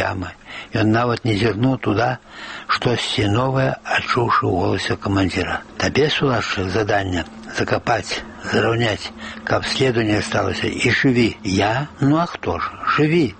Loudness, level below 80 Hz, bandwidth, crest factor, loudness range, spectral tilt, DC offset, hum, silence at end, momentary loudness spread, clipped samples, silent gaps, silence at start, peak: -19 LUFS; -44 dBFS; 8.8 kHz; 14 dB; 2 LU; -5.5 dB/octave; under 0.1%; none; 0.05 s; 9 LU; under 0.1%; none; 0 s; -4 dBFS